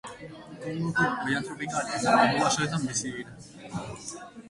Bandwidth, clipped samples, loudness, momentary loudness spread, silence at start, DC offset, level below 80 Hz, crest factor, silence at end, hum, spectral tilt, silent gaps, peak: 11.5 kHz; under 0.1%; -27 LUFS; 20 LU; 0.05 s; under 0.1%; -60 dBFS; 22 dB; 0 s; none; -4 dB/octave; none; -8 dBFS